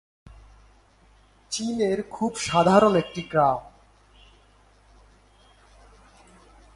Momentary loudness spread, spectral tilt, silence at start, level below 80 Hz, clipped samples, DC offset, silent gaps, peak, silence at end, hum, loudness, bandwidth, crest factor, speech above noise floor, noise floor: 12 LU; -5 dB/octave; 1.5 s; -54 dBFS; under 0.1%; under 0.1%; none; -4 dBFS; 3.1 s; none; -23 LUFS; 11.5 kHz; 24 dB; 35 dB; -57 dBFS